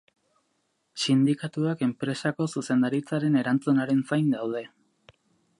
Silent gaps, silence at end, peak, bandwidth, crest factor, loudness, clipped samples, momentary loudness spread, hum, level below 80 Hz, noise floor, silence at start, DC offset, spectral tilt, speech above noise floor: none; 0.95 s; -12 dBFS; 11.5 kHz; 16 dB; -26 LUFS; under 0.1%; 7 LU; none; -74 dBFS; -74 dBFS; 0.95 s; under 0.1%; -6 dB/octave; 49 dB